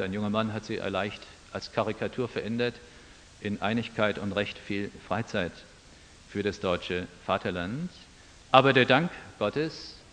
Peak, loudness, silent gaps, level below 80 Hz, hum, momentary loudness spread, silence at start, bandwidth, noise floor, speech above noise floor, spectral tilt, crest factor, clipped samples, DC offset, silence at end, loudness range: -2 dBFS; -29 LUFS; none; -58 dBFS; none; 15 LU; 0 s; 10 kHz; -53 dBFS; 24 dB; -6 dB/octave; 28 dB; under 0.1%; under 0.1%; 0.15 s; 6 LU